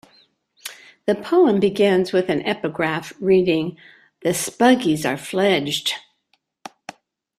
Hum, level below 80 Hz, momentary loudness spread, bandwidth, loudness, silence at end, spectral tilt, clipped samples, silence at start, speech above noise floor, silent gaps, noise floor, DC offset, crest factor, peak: none; -60 dBFS; 19 LU; 15 kHz; -20 LUFS; 1.4 s; -4.5 dB/octave; under 0.1%; 0.65 s; 49 dB; none; -68 dBFS; under 0.1%; 18 dB; -2 dBFS